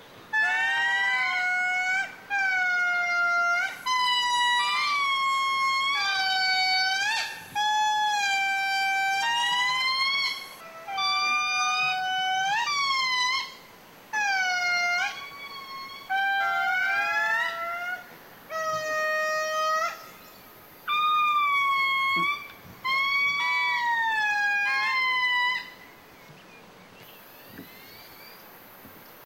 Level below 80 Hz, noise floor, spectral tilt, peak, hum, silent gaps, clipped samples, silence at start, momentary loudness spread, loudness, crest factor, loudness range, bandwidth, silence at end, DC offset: -72 dBFS; -50 dBFS; 0.5 dB/octave; -16 dBFS; none; none; under 0.1%; 0 s; 13 LU; -24 LUFS; 10 dB; 4 LU; 16.5 kHz; 0 s; under 0.1%